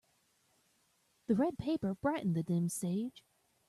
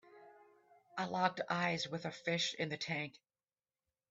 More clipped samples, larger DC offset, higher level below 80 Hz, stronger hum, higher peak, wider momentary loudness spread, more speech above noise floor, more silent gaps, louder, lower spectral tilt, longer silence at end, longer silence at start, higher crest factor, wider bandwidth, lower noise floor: neither; neither; first, -68 dBFS vs -80 dBFS; neither; about the same, -20 dBFS vs -18 dBFS; about the same, 6 LU vs 7 LU; second, 40 dB vs over 51 dB; neither; first, -35 LUFS vs -38 LUFS; first, -6.5 dB/octave vs -4 dB/octave; second, 0.5 s vs 1 s; first, 1.3 s vs 0.1 s; second, 16 dB vs 22 dB; first, 13.5 kHz vs 8 kHz; second, -75 dBFS vs under -90 dBFS